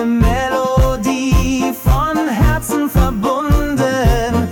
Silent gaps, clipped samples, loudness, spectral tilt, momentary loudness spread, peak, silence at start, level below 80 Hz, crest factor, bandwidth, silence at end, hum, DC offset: none; under 0.1%; -15 LUFS; -6 dB/octave; 2 LU; -4 dBFS; 0 s; -20 dBFS; 10 dB; 18 kHz; 0 s; none; under 0.1%